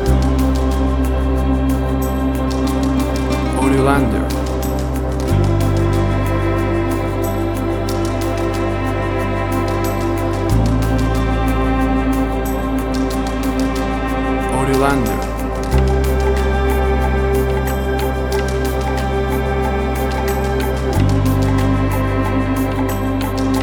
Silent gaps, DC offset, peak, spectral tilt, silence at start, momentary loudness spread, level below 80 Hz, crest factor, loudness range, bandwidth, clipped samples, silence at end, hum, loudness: none; under 0.1%; -2 dBFS; -6.5 dB/octave; 0 s; 4 LU; -22 dBFS; 14 dB; 2 LU; 19.5 kHz; under 0.1%; 0 s; none; -18 LUFS